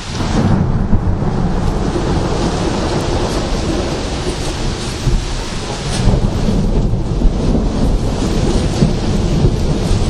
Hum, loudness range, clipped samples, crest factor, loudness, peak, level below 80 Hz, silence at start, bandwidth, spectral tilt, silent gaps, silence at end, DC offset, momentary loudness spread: none; 2 LU; under 0.1%; 14 dB; -17 LUFS; 0 dBFS; -18 dBFS; 0 s; 12 kHz; -6 dB/octave; none; 0 s; under 0.1%; 5 LU